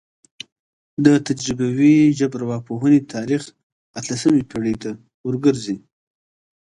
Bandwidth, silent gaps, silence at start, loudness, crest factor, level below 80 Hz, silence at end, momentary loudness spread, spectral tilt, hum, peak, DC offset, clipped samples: 11 kHz; 3.63-3.94 s, 5.14-5.24 s; 1 s; -19 LUFS; 20 dB; -54 dBFS; 0.85 s; 20 LU; -6 dB/octave; none; 0 dBFS; under 0.1%; under 0.1%